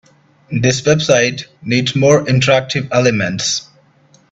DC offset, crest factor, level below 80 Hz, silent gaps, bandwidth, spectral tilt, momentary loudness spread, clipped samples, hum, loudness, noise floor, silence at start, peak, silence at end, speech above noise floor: under 0.1%; 16 dB; -50 dBFS; none; 8.2 kHz; -4.5 dB/octave; 6 LU; under 0.1%; none; -14 LUFS; -51 dBFS; 0.5 s; 0 dBFS; 0.7 s; 37 dB